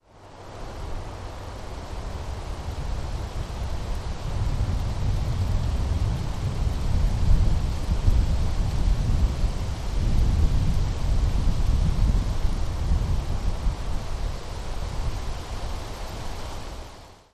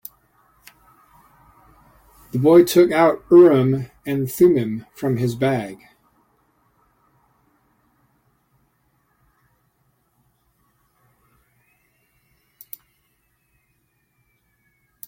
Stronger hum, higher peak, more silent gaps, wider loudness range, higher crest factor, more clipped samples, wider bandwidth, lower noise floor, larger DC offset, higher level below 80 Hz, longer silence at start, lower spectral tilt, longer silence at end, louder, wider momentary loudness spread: neither; second, -6 dBFS vs -2 dBFS; neither; second, 8 LU vs 12 LU; about the same, 18 dB vs 20 dB; neither; second, 12.5 kHz vs 16.5 kHz; second, -44 dBFS vs -67 dBFS; neither; first, -26 dBFS vs -60 dBFS; second, 0.15 s vs 2.35 s; about the same, -6.5 dB/octave vs -7 dB/octave; second, 0.2 s vs 9.35 s; second, -28 LUFS vs -17 LUFS; second, 12 LU vs 27 LU